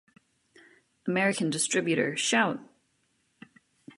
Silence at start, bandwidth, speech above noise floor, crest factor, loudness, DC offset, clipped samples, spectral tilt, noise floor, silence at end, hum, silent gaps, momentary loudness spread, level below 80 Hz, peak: 1.05 s; 11.5 kHz; 45 dB; 22 dB; -27 LUFS; under 0.1%; under 0.1%; -3 dB/octave; -72 dBFS; 1.35 s; none; none; 8 LU; -78 dBFS; -10 dBFS